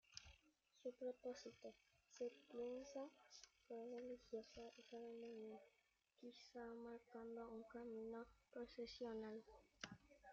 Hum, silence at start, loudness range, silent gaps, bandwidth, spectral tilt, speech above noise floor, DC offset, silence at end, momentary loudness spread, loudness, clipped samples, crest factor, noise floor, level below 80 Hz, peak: none; 0.1 s; 3 LU; none; 7.6 kHz; -3.5 dB/octave; 24 dB; under 0.1%; 0 s; 11 LU; -57 LUFS; under 0.1%; 20 dB; -79 dBFS; -82 dBFS; -36 dBFS